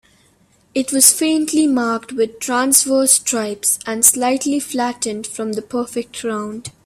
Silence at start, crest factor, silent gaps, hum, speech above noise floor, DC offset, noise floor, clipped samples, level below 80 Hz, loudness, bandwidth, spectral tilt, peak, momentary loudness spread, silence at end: 0.75 s; 18 dB; none; none; 38 dB; under 0.1%; -56 dBFS; under 0.1%; -60 dBFS; -16 LUFS; 16 kHz; -1.5 dB/octave; 0 dBFS; 13 LU; 0.15 s